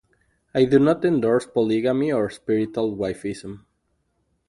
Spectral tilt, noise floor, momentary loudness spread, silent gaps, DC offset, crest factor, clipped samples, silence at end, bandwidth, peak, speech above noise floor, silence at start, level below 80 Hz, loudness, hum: -7 dB/octave; -71 dBFS; 13 LU; none; under 0.1%; 18 dB; under 0.1%; 0.9 s; 11.5 kHz; -6 dBFS; 50 dB; 0.55 s; -56 dBFS; -22 LUFS; none